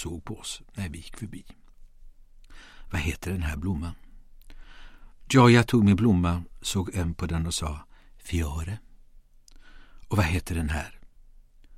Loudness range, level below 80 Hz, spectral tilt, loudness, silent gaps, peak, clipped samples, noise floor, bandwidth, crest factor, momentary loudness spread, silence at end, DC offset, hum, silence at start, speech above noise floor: 12 LU; -40 dBFS; -6 dB/octave; -26 LUFS; none; -4 dBFS; under 0.1%; -52 dBFS; 15.5 kHz; 24 dB; 21 LU; 0 s; under 0.1%; none; 0 s; 27 dB